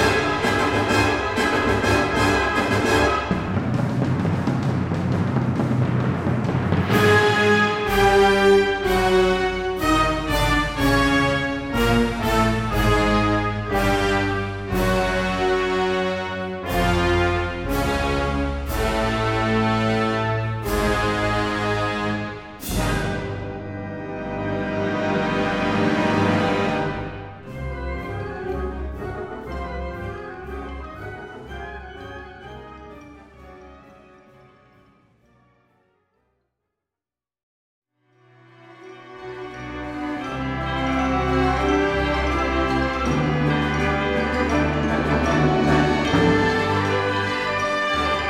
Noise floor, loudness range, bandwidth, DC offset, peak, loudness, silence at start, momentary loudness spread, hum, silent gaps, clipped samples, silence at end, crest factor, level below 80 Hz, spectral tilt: under -90 dBFS; 14 LU; 16.5 kHz; under 0.1%; -4 dBFS; -21 LUFS; 0 s; 14 LU; none; 37.43-37.82 s; under 0.1%; 0 s; 18 dB; -34 dBFS; -5.5 dB/octave